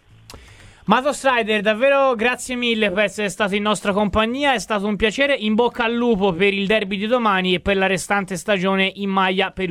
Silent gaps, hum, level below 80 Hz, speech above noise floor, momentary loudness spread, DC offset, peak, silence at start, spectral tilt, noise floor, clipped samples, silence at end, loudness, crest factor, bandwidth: none; none; -44 dBFS; 26 dB; 4 LU; under 0.1%; 0 dBFS; 0.3 s; -4.5 dB/octave; -45 dBFS; under 0.1%; 0 s; -19 LUFS; 20 dB; 15 kHz